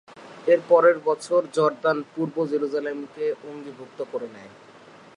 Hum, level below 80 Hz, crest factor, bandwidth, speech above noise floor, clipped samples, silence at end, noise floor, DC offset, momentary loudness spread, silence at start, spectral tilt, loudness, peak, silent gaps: none; -80 dBFS; 20 dB; 11 kHz; 25 dB; under 0.1%; 0.7 s; -48 dBFS; under 0.1%; 18 LU; 0.15 s; -6 dB/octave; -23 LUFS; -6 dBFS; none